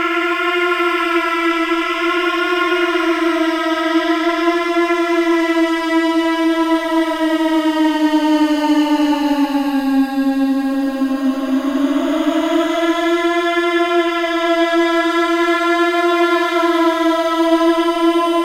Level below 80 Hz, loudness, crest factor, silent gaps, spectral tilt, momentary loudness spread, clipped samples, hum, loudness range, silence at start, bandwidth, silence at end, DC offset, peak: -52 dBFS; -16 LUFS; 14 dB; none; -2.5 dB/octave; 3 LU; under 0.1%; none; 2 LU; 0 s; 15.5 kHz; 0 s; under 0.1%; -2 dBFS